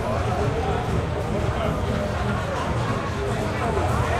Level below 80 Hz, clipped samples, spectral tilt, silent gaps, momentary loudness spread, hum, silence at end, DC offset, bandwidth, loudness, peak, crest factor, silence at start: -34 dBFS; under 0.1%; -6.5 dB/octave; none; 2 LU; none; 0 s; under 0.1%; 14 kHz; -25 LUFS; -10 dBFS; 12 dB; 0 s